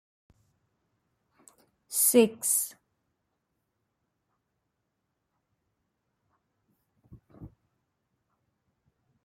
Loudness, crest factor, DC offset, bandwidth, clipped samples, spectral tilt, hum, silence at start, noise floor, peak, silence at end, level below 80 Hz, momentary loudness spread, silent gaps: -25 LUFS; 26 dB; under 0.1%; 16 kHz; under 0.1%; -2.5 dB/octave; none; 1.9 s; -81 dBFS; -8 dBFS; 1.75 s; -72 dBFS; 11 LU; none